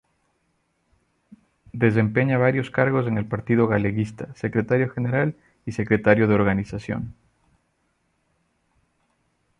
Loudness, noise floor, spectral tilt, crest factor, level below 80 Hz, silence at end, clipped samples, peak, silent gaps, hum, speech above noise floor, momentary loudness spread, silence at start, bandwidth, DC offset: -22 LUFS; -70 dBFS; -9 dB/octave; 22 dB; -52 dBFS; 2.5 s; under 0.1%; -2 dBFS; none; none; 49 dB; 12 LU; 1.75 s; 9.8 kHz; under 0.1%